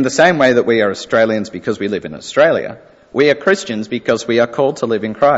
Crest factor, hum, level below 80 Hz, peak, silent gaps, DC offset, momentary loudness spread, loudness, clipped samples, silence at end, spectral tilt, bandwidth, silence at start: 14 dB; none; -56 dBFS; 0 dBFS; none; under 0.1%; 9 LU; -15 LUFS; under 0.1%; 0 s; -4.5 dB/octave; 8 kHz; 0 s